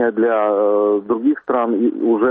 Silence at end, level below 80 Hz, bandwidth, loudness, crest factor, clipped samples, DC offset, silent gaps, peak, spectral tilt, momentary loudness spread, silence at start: 0 s; -64 dBFS; 3.8 kHz; -17 LUFS; 10 dB; under 0.1%; under 0.1%; none; -6 dBFS; -5.5 dB/octave; 3 LU; 0 s